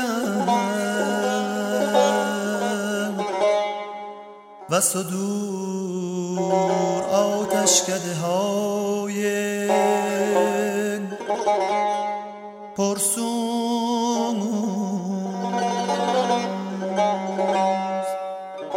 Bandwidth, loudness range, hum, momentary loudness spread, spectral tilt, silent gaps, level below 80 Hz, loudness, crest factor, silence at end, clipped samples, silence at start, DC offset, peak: 16.5 kHz; 3 LU; none; 8 LU; -4 dB/octave; none; -72 dBFS; -23 LUFS; 18 dB; 0 s; under 0.1%; 0 s; under 0.1%; -4 dBFS